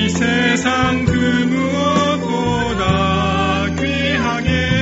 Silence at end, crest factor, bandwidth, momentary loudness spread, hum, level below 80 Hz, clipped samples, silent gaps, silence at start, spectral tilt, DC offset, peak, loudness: 0 s; 16 dB; 8 kHz; 3 LU; none; -32 dBFS; under 0.1%; none; 0 s; -4 dB/octave; under 0.1%; 0 dBFS; -16 LUFS